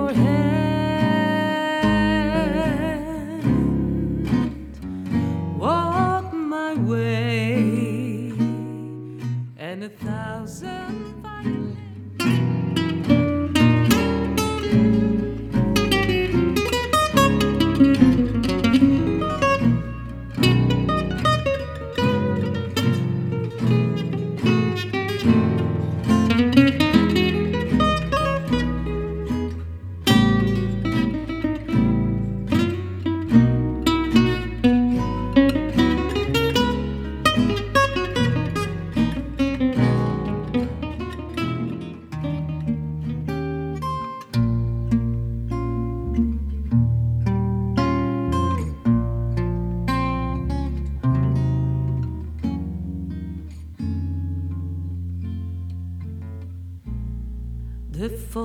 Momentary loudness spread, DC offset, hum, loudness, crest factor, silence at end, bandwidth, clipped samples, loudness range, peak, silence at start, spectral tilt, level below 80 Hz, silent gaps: 13 LU; under 0.1%; none; -22 LUFS; 20 dB; 0 s; 15.5 kHz; under 0.1%; 9 LU; -2 dBFS; 0 s; -6.5 dB/octave; -34 dBFS; none